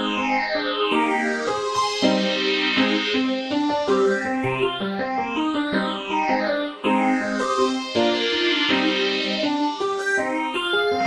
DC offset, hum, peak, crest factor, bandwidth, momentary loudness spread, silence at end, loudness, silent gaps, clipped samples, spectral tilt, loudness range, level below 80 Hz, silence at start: under 0.1%; none; -6 dBFS; 16 dB; 12 kHz; 5 LU; 0 s; -21 LUFS; none; under 0.1%; -4 dB/octave; 2 LU; -58 dBFS; 0 s